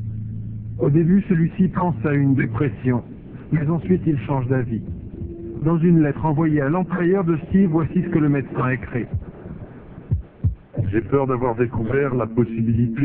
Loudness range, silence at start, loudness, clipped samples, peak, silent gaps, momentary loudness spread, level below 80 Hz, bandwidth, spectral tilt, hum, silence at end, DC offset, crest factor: 5 LU; 0 s; -21 LUFS; under 0.1%; -6 dBFS; none; 14 LU; -40 dBFS; 3.6 kHz; -14 dB/octave; none; 0 s; under 0.1%; 16 dB